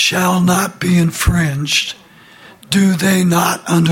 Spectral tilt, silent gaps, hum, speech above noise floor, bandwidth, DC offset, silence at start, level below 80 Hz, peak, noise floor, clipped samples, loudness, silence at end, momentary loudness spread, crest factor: -4.5 dB/octave; none; none; 28 dB; 17 kHz; under 0.1%; 0 s; -32 dBFS; -2 dBFS; -41 dBFS; under 0.1%; -14 LUFS; 0 s; 4 LU; 14 dB